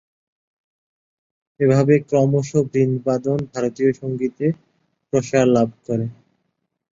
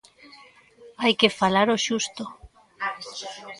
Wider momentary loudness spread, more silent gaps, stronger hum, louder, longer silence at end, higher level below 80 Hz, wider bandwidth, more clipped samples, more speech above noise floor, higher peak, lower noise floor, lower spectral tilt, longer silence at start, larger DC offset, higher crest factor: second, 9 LU vs 16 LU; neither; neither; first, -19 LUFS vs -23 LUFS; first, 0.8 s vs 0 s; about the same, -56 dBFS vs -60 dBFS; second, 7.8 kHz vs 11.5 kHz; neither; first, 55 dB vs 28 dB; about the same, -2 dBFS vs -2 dBFS; first, -73 dBFS vs -52 dBFS; first, -7.5 dB/octave vs -3 dB/octave; first, 1.6 s vs 0.25 s; neither; second, 18 dB vs 24 dB